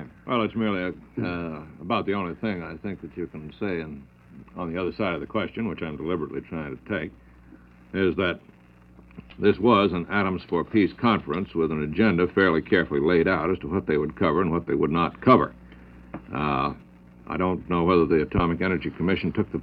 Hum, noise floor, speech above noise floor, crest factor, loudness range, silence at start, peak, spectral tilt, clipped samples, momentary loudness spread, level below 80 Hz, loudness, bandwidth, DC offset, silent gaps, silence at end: none; -51 dBFS; 27 dB; 20 dB; 8 LU; 0 s; -4 dBFS; -9.5 dB/octave; under 0.1%; 14 LU; -48 dBFS; -25 LUFS; 5.2 kHz; under 0.1%; none; 0 s